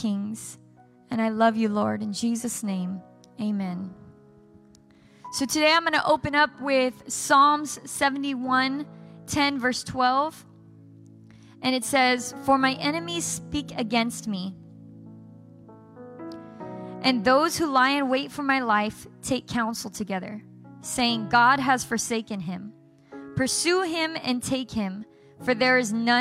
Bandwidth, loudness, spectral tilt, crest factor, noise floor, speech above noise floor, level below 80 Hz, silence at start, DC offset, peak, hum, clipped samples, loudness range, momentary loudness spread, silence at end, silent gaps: 16 kHz; -24 LUFS; -3.5 dB/octave; 18 dB; -55 dBFS; 30 dB; -60 dBFS; 0 s; under 0.1%; -8 dBFS; none; under 0.1%; 8 LU; 17 LU; 0 s; none